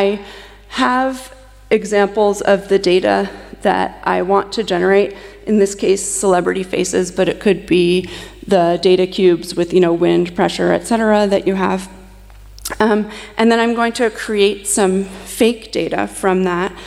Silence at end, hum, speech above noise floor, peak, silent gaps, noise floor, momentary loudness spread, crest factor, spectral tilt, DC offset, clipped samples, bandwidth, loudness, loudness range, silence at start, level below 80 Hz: 0 s; none; 23 dB; -2 dBFS; none; -39 dBFS; 8 LU; 14 dB; -4.5 dB/octave; under 0.1%; under 0.1%; 14.5 kHz; -16 LUFS; 2 LU; 0 s; -44 dBFS